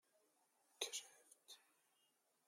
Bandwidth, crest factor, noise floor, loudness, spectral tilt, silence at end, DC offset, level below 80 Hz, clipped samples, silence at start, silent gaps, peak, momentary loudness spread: 16 kHz; 32 dB; -83 dBFS; -49 LUFS; 3 dB/octave; 0.85 s; under 0.1%; under -90 dBFS; under 0.1%; 0.8 s; none; -26 dBFS; 17 LU